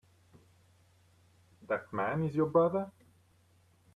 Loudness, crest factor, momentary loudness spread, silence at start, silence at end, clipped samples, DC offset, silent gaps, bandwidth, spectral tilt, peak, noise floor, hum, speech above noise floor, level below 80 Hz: -32 LUFS; 20 dB; 10 LU; 1.7 s; 1.05 s; under 0.1%; under 0.1%; none; 10.5 kHz; -9 dB/octave; -16 dBFS; -67 dBFS; none; 36 dB; -72 dBFS